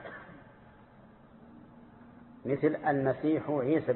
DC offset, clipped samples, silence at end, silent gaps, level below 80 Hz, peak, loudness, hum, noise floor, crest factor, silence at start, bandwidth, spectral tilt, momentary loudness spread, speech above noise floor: under 0.1%; under 0.1%; 0 s; none; -66 dBFS; -16 dBFS; -30 LUFS; none; -56 dBFS; 18 dB; 0 s; 4.2 kHz; -11.5 dB/octave; 24 LU; 27 dB